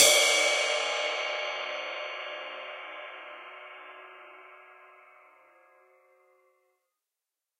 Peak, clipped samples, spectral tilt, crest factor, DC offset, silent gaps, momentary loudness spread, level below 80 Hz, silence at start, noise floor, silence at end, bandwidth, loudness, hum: -4 dBFS; under 0.1%; 2.5 dB/octave; 26 dB; under 0.1%; none; 25 LU; -80 dBFS; 0 s; -89 dBFS; 2.85 s; 15.5 kHz; -27 LUFS; none